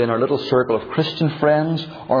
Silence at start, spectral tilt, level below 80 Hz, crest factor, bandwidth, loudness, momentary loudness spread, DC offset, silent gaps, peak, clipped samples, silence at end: 0 s; -8 dB/octave; -56 dBFS; 14 dB; 5.4 kHz; -20 LUFS; 5 LU; under 0.1%; none; -4 dBFS; under 0.1%; 0 s